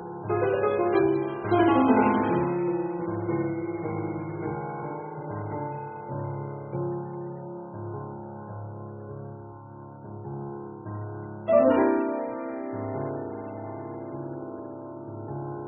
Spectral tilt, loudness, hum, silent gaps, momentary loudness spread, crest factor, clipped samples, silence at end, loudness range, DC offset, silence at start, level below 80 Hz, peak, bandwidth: -4.5 dB/octave; -28 LUFS; none; none; 18 LU; 20 dB; under 0.1%; 0 s; 15 LU; under 0.1%; 0 s; -62 dBFS; -8 dBFS; 3.5 kHz